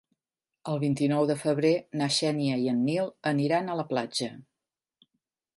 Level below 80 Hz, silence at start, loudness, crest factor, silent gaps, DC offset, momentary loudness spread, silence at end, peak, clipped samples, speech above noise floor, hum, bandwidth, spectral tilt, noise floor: -74 dBFS; 0.65 s; -28 LUFS; 16 dB; none; under 0.1%; 7 LU; 1.15 s; -12 dBFS; under 0.1%; 62 dB; none; 11.5 kHz; -5.5 dB/octave; -89 dBFS